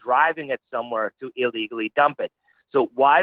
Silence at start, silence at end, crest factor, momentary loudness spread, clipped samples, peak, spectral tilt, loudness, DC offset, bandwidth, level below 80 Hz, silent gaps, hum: 0.05 s; 0 s; 18 dB; 10 LU; under 0.1%; -4 dBFS; -7.5 dB/octave; -23 LUFS; under 0.1%; 4.9 kHz; -78 dBFS; none; none